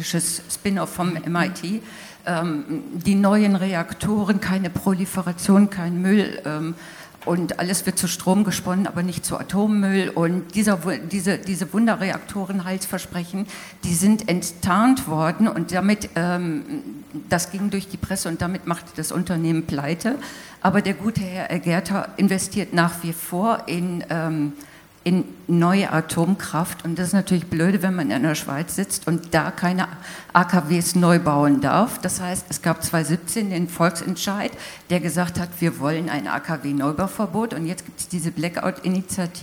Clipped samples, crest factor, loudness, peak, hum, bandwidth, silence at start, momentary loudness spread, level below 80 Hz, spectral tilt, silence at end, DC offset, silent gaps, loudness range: under 0.1%; 22 dB; -22 LUFS; 0 dBFS; none; 19.5 kHz; 0 s; 10 LU; -52 dBFS; -5 dB/octave; 0 s; under 0.1%; none; 4 LU